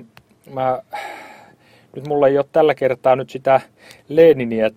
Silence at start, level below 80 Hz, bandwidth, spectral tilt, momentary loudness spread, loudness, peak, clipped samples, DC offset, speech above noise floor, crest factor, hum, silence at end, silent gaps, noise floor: 0 s; -60 dBFS; 14 kHz; -7 dB/octave; 20 LU; -17 LUFS; 0 dBFS; under 0.1%; under 0.1%; 33 dB; 18 dB; none; 0.05 s; none; -50 dBFS